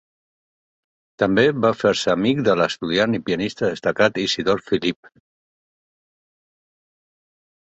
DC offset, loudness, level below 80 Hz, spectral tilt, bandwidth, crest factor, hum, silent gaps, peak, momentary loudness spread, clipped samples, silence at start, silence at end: under 0.1%; -20 LUFS; -56 dBFS; -5 dB/octave; 8.2 kHz; 20 dB; none; none; -2 dBFS; 6 LU; under 0.1%; 1.2 s; 2.75 s